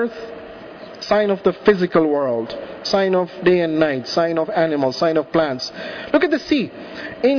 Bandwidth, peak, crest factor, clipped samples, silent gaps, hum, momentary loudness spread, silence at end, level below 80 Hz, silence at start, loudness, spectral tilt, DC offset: 5.4 kHz; -4 dBFS; 16 dB; under 0.1%; none; none; 15 LU; 0 s; -54 dBFS; 0 s; -19 LUFS; -6 dB/octave; under 0.1%